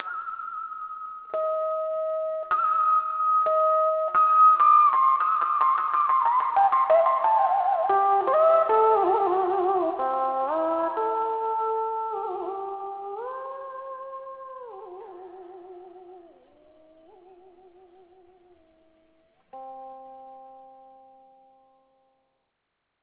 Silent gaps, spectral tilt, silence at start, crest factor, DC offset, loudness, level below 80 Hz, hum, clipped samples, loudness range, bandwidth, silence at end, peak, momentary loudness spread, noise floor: none; -7 dB/octave; 0 s; 16 dB; under 0.1%; -23 LUFS; -72 dBFS; none; under 0.1%; 18 LU; 4 kHz; 2.45 s; -8 dBFS; 22 LU; -79 dBFS